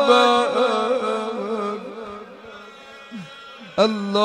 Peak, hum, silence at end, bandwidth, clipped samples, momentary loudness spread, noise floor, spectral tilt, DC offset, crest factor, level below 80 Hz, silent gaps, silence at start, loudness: -4 dBFS; none; 0 s; 10.5 kHz; under 0.1%; 23 LU; -42 dBFS; -4.5 dB/octave; under 0.1%; 18 dB; -66 dBFS; none; 0 s; -20 LUFS